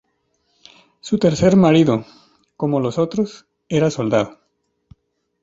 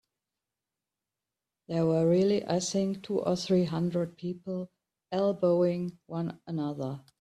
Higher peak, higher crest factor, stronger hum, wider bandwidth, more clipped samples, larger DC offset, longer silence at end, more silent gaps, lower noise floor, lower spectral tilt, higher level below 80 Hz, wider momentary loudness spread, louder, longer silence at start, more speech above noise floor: first, -2 dBFS vs -14 dBFS; about the same, 18 dB vs 16 dB; neither; second, 7.8 kHz vs 11.5 kHz; neither; neither; first, 1.15 s vs 0.2 s; neither; second, -69 dBFS vs -90 dBFS; about the same, -7 dB/octave vs -6.5 dB/octave; first, -50 dBFS vs -68 dBFS; about the same, 12 LU vs 12 LU; first, -18 LUFS vs -30 LUFS; second, 1.05 s vs 1.7 s; second, 52 dB vs 61 dB